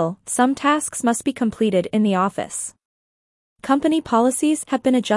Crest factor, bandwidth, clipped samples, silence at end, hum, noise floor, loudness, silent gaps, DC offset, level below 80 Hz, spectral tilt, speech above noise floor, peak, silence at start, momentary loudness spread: 16 dB; 12 kHz; under 0.1%; 0 s; none; under -90 dBFS; -20 LUFS; 2.85-3.56 s; under 0.1%; -60 dBFS; -4.5 dB/octave; over 71 dB; -4 dBFS; 0 s; 8 LU